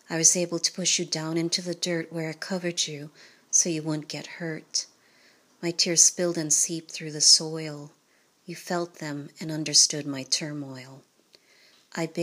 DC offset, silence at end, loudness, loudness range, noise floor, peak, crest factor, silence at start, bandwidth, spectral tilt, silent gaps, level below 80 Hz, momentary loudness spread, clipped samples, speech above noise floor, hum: under 0.1%; 0 s; -24 LUFS; 6 LU; -65 dBFS; -4 dBFS; 24 dB; 0.1 s; 15.5 kHz; -2 dB/octave; none; -84 dBFS; 19 LU; under 0.1%; 38 dB; none